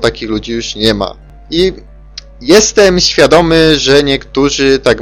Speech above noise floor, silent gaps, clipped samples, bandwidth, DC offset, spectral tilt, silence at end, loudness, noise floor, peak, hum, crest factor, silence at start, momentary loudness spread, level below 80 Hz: 23 dB; none; 0.5%; 16 kHz; under 0.1%; -3.5 dB/octave; 0 s; -9 LUFS; -32 dBFS; 0 dBFS; none; 10 dB; 0 s; 11 LU; -30 dBFS